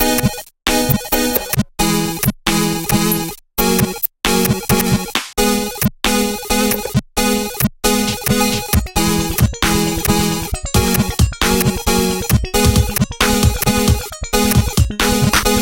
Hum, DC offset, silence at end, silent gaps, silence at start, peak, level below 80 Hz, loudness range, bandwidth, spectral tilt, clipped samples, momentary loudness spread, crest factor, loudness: none; under 0.1%; 0 s; none; 0 s; 0 dBFS; -26 dBFS; 2 LU; 17.5 kHz; -4 dB/octave; under 0.1%; 4 LU; 16 dB; -16 LUFS